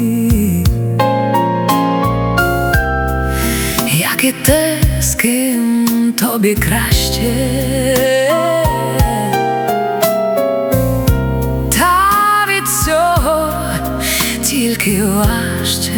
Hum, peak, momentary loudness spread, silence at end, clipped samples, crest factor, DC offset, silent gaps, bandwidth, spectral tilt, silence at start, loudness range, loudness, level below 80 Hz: none; 0 dBFS; 4 LU; 0 s; under 0.1%; 14 dB; under 0.1%; none; over 20 kHz; -4.5 dB/octave; 0 s; 1 LU; -14 LUFS; -24 dBFS